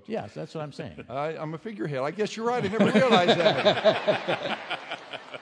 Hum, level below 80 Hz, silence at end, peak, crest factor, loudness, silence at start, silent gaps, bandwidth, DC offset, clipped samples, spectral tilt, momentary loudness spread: none; -68 dBFS; 0 s; -4 dBFS; 20 dB; -25 LUFS; 0.1 s; none; 10.5 kHz; under 0.1%; under 0.1%; -5.5 dB/octave; 17 LU